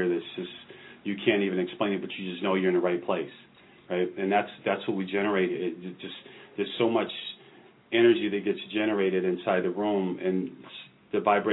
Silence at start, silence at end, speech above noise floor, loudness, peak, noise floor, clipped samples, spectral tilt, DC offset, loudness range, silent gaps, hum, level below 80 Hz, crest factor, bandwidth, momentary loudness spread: 0 s; 0 s; 27 dB; -28 LUFS; -10 dBFS; -54 dBFS; under 0.1%; -9.5 dB/octave; under 0.1%; 3 LU; none; none; -76 dBFS; 18 dB; 4.1 kHz; 15 LU